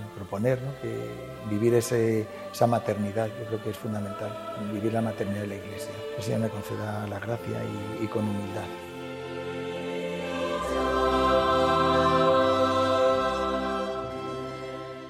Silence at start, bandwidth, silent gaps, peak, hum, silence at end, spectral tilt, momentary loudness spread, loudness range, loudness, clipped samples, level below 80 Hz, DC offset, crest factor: 0 s; 16 kHz; none; -8 dBFS; none; 0 s; -6 dB/octave; 13 LU; 9 LU; -28 LUFS; under 0.1%; -50 dBFS; under 0.1%; 18 dB